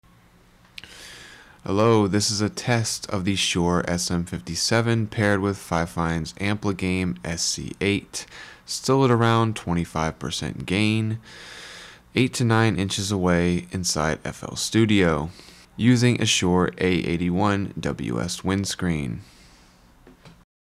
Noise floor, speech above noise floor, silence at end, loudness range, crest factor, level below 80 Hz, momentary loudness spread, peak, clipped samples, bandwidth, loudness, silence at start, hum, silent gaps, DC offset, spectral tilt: -54 dBFS; 32 dB; 0.35 s; 4 LU; 16 dB; -50 dBFS; 17 LU; -8 dBFS; under 0.1%; 15 kHz; -23 LUFS; 0.85 s; none; none; under 0.1%; -4.5 dB/octave